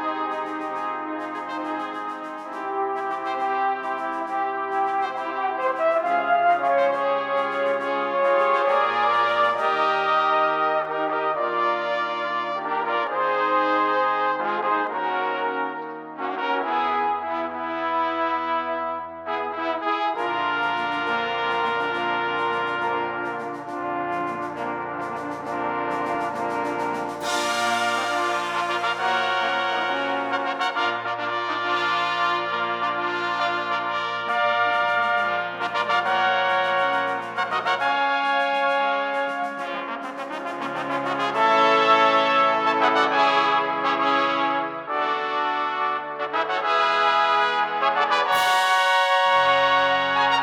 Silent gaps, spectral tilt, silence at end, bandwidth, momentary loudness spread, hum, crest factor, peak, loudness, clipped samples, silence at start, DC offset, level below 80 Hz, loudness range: none; -3 dB/octave; 0 s; 18 kHz; 10 LU; none; 18 dB; -6 dBFS; -23 LUFS; under 0.1%; 0 s; under 0.1%; -72 dBFS; 7 LU